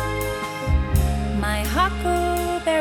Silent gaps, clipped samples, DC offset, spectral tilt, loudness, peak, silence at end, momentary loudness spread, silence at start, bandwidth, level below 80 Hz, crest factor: none; under 0.1%; under 0.1%; -5.5 dB/octave; -23 LUFS; -6 dBFS; 0 s; 5 LU; 0 s; 18.5 kHz; -26 dBFS; 16 dB